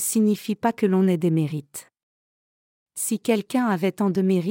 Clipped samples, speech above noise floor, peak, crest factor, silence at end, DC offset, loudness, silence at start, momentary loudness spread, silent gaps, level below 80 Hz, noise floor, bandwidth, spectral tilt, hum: under 0.1%; over 68 dB; -8 dBFS; 16 dB; 0 s; under 0.1%; -23 LUFS; 0 s; 11 LU; 2.03-2.86 s; -74 dBFS; under -90 dBFS; 17 kHz; -6 dB/octave; none